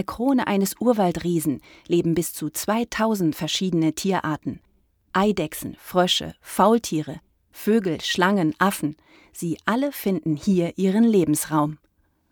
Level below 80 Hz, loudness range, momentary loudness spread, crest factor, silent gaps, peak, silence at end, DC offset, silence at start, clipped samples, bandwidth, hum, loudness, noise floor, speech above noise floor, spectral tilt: -54 dBFS; 2 LU; 11 LU; 18 dB; none; -4 dBFS; 0.55 s; under 0.1%; 0 s; under 0.1%; over 20 kHz; none; -23 LUFS; -65 dBFS; 43 dB; -5 dB/octave